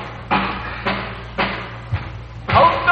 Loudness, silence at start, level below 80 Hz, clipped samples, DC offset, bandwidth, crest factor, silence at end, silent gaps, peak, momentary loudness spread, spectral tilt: -20 LUFS; 0 s; -36 dBFS; under 0.1%; under 0.1%; 7.8 kHz; 18 dB; 0 s; none; -2 dBFS; 14 LU; -7 dB/octave